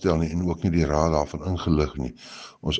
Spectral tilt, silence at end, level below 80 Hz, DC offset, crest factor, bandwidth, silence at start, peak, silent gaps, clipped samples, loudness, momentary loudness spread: -6.5 dB/octave; 0 s; -36 dBFS; under 0.1%; 20 dB; 8.4 kHz; 0 s; -4 dBFS; none; under 0.1%; -25 LUFS; 12 LU